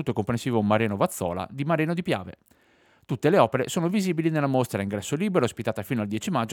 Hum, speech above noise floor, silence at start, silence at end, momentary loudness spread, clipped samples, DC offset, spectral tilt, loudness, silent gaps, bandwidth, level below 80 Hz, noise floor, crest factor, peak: none; 36 dB; 0 s; 0 s; 8 LU; under 0.1%; under 0.1%; -6 dB/octave; -25 LUFS; none; 19.5 kHz; -62 dBFS; -61 dBFS; 22 dB; -4 dBFS